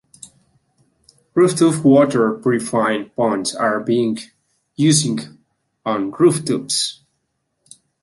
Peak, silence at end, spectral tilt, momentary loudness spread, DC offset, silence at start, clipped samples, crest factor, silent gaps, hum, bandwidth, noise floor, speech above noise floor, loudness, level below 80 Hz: -2 dBFS; 1.1 s; -4.5 dB/octave; 11 LU; under 0.1%; 1.35 s; under 0.1%; 16 dB; none; none; 12 kHz; -71 dBFS; 55 dB; -17 LUFS; -62 dBFS